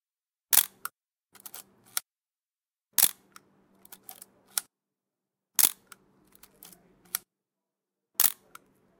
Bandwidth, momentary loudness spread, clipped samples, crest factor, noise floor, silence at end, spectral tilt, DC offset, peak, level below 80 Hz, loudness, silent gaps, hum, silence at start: 19 kHz; 24 LU; under 0.1%; 30 dB; under -90 dBFS; 0.7 s; 2 dB/octave; under 0.1%; -2 dBFS; -80 dBFS; -26 LUFS; none; none; 0.5 s